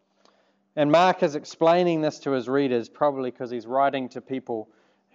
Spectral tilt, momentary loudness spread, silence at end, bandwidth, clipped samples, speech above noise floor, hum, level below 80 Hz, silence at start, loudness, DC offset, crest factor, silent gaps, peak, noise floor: -6 dB/octave; 15 LU; 0.5 s; 7.8 kHz; under 0.1%; 41 dB; none; -80 dBFS; 0.75 s; -24 LUFS; under 0.1%; 20 dB; none; -6 dBFS; -64 dBFS